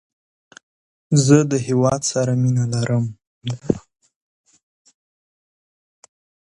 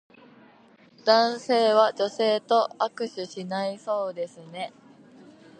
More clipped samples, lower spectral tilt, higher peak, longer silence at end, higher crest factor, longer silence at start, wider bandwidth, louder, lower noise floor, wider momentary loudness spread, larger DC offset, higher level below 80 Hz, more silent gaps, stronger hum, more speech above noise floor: neither; first, -6 dB/octave vs -4 dB/octave; first, 0 dBFS vs -4 dBFS; first, 2.7 s vs 0.9 s; about the same, 22 dB vs 22 dB; about the same, 1.1 s vs 1.05 s; first, 11.5 kHz vs 9.6 kHz; first, -19 LUFS vs -25 LUFS; first, under -90 dBFS vs -55 dBFS; about the same, 14 LU vs 15 LU; neither; first, -54 dBFS vs -82 dBFS; first, 3.27-3.41 s vs none; neither; first, over 73 dB vs 31 dB